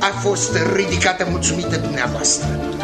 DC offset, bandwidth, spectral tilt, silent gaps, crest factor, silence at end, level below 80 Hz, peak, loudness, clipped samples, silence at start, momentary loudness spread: under 0.1%; 14 kHz; -3.5 dB/octave; none; 18 dB; 0 s; -36 dBFS; 0 dBFS; -18 LUFS; under 0.1%; 0 s; 4 LU